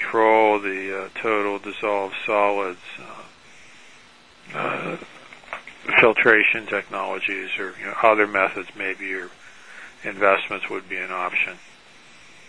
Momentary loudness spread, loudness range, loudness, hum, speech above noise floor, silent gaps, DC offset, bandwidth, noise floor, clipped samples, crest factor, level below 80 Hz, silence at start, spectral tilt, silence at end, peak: 20 LU; 8 LU; -21 LUFS; none; 28 dB; none; 0.3%; 10.5 kHz; -50 dBFS; under 0.1%; 22 dB; -64 dBFS; 0 s; -4.5 dB/octave; 0.9 s; 0 dBFS